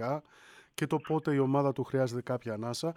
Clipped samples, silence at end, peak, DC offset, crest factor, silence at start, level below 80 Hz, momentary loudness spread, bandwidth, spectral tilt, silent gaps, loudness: under 0.1%; 0.05 s; -16 dBFS; under 0.1%; 16 dB; 0 s; -72 dBFS; 9 LU; 15 kHz; -6.5 dB/octave; none; -32 LUFS